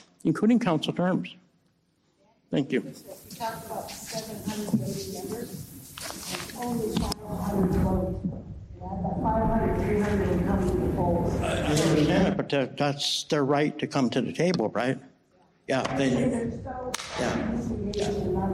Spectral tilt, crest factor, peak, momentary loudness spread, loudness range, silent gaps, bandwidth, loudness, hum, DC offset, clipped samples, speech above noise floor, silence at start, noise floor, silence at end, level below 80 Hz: -5.5 dB/octave; 16 dB; -12 dBFS; 12 LU; 8 LU; none; 16 kHz; -27 LUFS; none; under 0.1%; under 0.1%; 42 dB; 0.25 s; -69 dBFS; 0 s; -42 dBFS